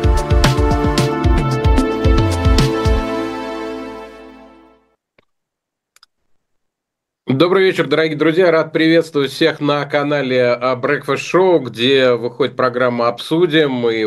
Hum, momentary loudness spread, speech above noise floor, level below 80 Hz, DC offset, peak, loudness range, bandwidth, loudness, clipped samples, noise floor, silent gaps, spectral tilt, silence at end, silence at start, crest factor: none; 8 LU; 66 dB; -24 dBFS; under 0.1%; 0 dBFS; 10 LU; 15 kHz; -15 LUFS; under 0.1%; -80 dBFS; none; -6 dB/octave; 0 s; 0 s; 16 dB